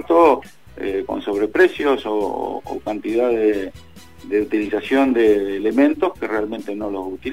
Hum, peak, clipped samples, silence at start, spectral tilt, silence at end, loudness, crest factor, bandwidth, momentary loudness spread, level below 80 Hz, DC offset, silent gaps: none; -4 dBFS; under 0.1%; 0 s; -6 dB/octave; 0 s; -19 LUFS; 16 dB; 15.5 kHz; 11 LU; -50 dBFS; 0.5%; none